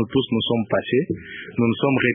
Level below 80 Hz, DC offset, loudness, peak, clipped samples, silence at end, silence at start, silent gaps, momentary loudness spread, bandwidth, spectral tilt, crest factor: -52 dBFS; under 0.1%; -22 LUFS; -4 dBFS; under 0.1%; 0 s; 0 s; none; 10 LU; 3.8 kHz; -11 dB/octave; 18 dB